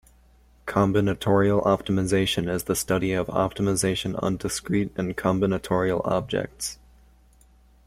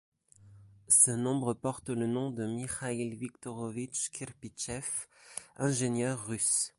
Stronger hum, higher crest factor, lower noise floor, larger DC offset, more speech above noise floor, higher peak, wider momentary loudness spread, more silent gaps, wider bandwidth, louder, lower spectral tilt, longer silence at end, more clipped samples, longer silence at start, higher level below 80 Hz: neither; second, 18 dB vs 26 dB; about the same, -56 dBFS vs -58 dBFS; neither; first, 32 dB vs 25 dB; about the same, -6 dBFS vs -8 dBFS; second, 7 LU vs 17 LU; neither; first, 16 kHz vs 12 kHz; first, -24 LUFS vs -31 LUFS; about the same, -5 dB/octave vs -4 dB/octave; first, 1.15 s vs 0.1 s; neither; first, 0.65 s vs 0.45 s; first, -48 dBFS vs -66 dBFS